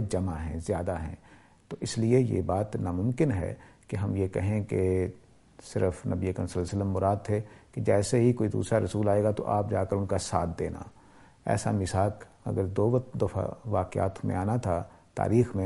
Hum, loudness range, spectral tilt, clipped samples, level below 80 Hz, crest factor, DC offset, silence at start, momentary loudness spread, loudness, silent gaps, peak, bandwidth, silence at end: none; 3 LU; -7 dB/octave; under 0.1%; -50 dBFS; 18 dB; under 0.1%; 0 s; 11 LU; -29 LUFS; none; -10 dBFS; 11.5 kHz; 0 s